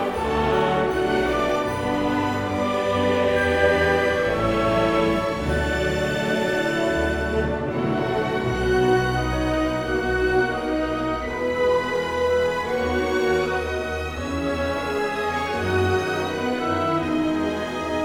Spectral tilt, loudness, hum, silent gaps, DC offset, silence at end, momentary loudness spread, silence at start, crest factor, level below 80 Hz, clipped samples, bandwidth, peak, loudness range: -6 dB/octave; -22 LUFS; none; none; under 0.1%; 0 s; 5 LU; 0 s; 16 dB; -38 dBFS; under 0.1%; 18 kHz; -6 dBFS; 3 LU